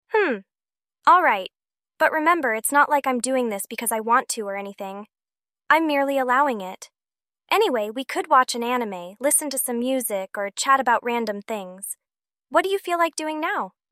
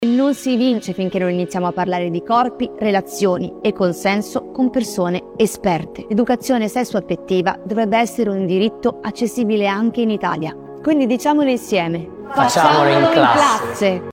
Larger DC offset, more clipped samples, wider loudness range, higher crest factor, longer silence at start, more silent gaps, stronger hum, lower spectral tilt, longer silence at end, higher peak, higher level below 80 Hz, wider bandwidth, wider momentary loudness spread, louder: neither; neither; about the same, 3 LU vs 4 LU; about the same, 18 dB vs 18 dB; about the same, 0.1 s vs 0 s; neither; neither; second, -2 dB/octave vs -5.5 dB/octave; first, 0.2 s vs 0 s; second, -4 dBFS vs 0 dBFS; second, -74 dBFS vs -52 dBFS; about the same, 16 kHz vs 16.5 kHz; first, 13 LU vs 9 LU; second, -22 LUFS vs -18 LUFS